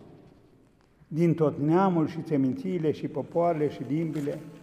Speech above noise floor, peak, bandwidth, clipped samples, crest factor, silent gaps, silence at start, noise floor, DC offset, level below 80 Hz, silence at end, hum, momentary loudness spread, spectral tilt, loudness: 34 dB; -12 dBFS; 11 kHz; under 0.1%; 16 dB; none; 0 s; -60 dBFS; under 0.1%; -66 dBFS; 0 s; none; 8 LU; -9 dB/octave; -27 LUFS